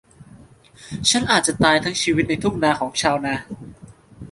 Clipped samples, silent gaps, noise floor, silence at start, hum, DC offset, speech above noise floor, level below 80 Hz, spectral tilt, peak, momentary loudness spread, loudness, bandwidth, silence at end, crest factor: under 0.1%; none; -47 dBFS; 0.2 s; none; under 0.1%; 27 dB; -46 dBFS; -3 dB/octave; -2 dBFS; 13 LU; -19 LUFS; 12 kHz; 0 s; 20 dB